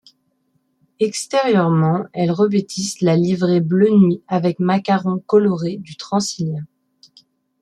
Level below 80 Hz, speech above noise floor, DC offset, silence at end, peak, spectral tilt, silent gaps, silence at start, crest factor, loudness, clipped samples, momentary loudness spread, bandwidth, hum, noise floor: -62 dBFS; 49 dB; under 0.1%; 0.95 s; -2 dBFS; -6.5 dB/octave; none; 1 s; 16 dB; -18 LUFS; under 0.1%; 9 LU; 12 kHz; none; -66 dBFS